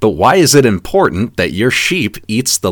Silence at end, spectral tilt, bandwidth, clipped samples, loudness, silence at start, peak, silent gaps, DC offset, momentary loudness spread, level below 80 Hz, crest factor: 0 s; -4 dB/octave; 19.5 kHz; 0.5%; -12 LUFS; 0 s; 0 dBFS; none; under 0.1%; 8 LU; -38 dBFS; 12 dB